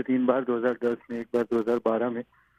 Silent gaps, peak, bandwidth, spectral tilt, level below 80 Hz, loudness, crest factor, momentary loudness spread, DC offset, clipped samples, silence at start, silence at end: none; -8 dBFS; 7.4 kHz; -7.5 dB/octave; -68 dBFS; -27 LUFS; 18 dB; 7 LU; under 0.1%; under 0.1%; 0 s; 0.35 s